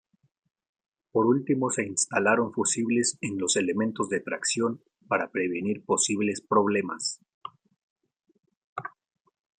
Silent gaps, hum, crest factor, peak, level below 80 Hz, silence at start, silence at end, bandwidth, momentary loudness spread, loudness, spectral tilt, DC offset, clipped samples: 7.34-7.41 s, 7.83-7.96 s, 8.57-8.76 s; none; 20 dB; -8 dBFS; -74 dBFS; 1.15 s; 0.7 s; 10.5 kHz; 15 LU; -26 LUFS; -3.5 dB/octave; under 0.1%; under 0.1%